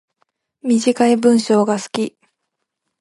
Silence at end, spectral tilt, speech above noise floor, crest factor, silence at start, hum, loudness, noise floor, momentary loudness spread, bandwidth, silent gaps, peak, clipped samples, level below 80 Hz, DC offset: 0.95 s; -5 dB/octave; 61 dB; 16 dB; 0.65 s; none; -16 LUFS; -77 dBFS; 11 LU; 11.5 kHz; none; -2 dBFS; under 0.1%; -68 dBFS; under 0.1%